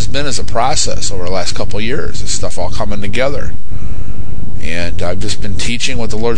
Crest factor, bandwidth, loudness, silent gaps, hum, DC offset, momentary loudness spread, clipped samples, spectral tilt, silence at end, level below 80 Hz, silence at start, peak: 18 dB; 10.5 kHz; -19 LUFS; none; none; 60%; 11 LU; under 0.1%; -3.5 dB/octave; 0 s; -26 dBFS; 0 s; 0 dBFS